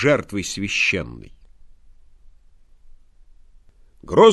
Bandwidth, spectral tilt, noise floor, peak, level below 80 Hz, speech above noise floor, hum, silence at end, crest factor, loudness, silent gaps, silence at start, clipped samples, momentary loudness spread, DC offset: 12.5 kHz; -4.5 dB/octave; -49 dBFS; 0 dBFS; -48 dBFS; 32 dB; none; 0 s; 22 dB; -20 LUFS; none; 0 s; under 0.1%; 16 LU; under 0.1%